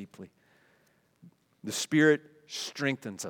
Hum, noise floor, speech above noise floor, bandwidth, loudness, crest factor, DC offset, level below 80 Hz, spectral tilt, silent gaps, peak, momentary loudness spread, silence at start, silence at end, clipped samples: none; -68 dBFS; 39 dB; 18 kHz; -29 LUFS; 22 dB; under 0.1%; -84 dBFS; -4 dB/octave; none; -10 dBFS; 21 LU; 0 s; 0 s; under 0.1%